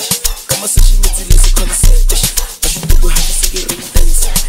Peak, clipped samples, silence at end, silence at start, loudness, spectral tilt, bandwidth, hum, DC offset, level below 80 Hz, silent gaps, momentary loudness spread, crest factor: 0 dBFS; 0.4%; 0 s; 0 s; -13 LUFS; -2.5 dB/octave; 16.5 kHz; none; under 0.1%; -10 dBFS; none; 4 LU; 8 dB